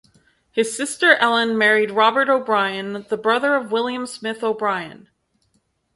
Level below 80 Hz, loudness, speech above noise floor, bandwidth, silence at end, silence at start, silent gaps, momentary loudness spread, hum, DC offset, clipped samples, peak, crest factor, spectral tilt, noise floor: -68 dBFS; -19 LUFS; 48 dB; 11.5 kHz; 1 s; 0.55 s; none; 12 LU; none; under 0.1%; under 0.1%; 0 dBFS; 20 dB; -3 dB/octave; -67 dBFS